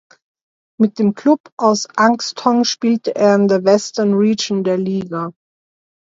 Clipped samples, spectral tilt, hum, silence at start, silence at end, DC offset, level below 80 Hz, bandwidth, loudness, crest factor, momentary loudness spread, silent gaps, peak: under 0.1%; -5 dB/octave; none; 0.8 s; 0.8 s; under 0.1%; -66 dBFS; 7.8 kHz; -16 LUFS; 16 dB; 6 LU; 1.40-1.44 s, 1.52-1.57 s; 0 dBFS